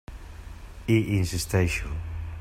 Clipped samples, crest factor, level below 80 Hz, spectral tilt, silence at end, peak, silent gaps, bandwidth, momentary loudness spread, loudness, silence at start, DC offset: under 0.1%; 18 dB; -38 dBFS; -5.5 dB/octave; 0 s; -10 dBFS; none; 16 kHz; 21 LU; -27 LUFS; 0.1 s; under 0.1%